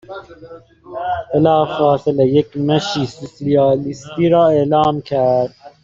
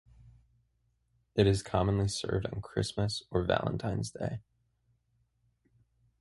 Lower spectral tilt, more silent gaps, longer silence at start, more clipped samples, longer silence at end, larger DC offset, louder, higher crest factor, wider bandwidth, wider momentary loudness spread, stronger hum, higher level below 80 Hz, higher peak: about the same, -7 dB/octave vs -6 dB/octave; neither; second, 0.1 s vs 0.25 s; neither; second, 0.15 s vs 1.8 s; neither; first, -16 LUFS vs -32 LUFS; second, 14 dB vs 24 dB; second, 7.6 kHz vs 11.5 kHz; first, 12 LU vs 9 LU; neither; about the same, -50 dBFS vs -50 dBFS; first, -2 dBFS vs -10 dBFS